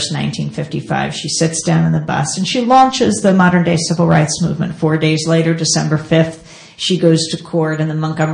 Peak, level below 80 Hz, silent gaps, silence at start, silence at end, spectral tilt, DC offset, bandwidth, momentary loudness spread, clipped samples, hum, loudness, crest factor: 0 dBFS; -48 dBFS; none; 0 s; 0 s; -5 dB/octave; under 0.1%; 10.5 kHz; 8 LU; under 0.1%; none; -14 LUFS; 14 dB